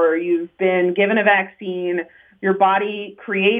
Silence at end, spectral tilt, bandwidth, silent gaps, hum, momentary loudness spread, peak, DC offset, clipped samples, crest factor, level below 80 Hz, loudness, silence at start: 0 s; -8 dB/octave; 3.8 kHz; none; none; 10 LU; -2 dBFS; under 0.1%; under 0.1%; 16 dB; -72 dBFS; -19 LUFS; 0 s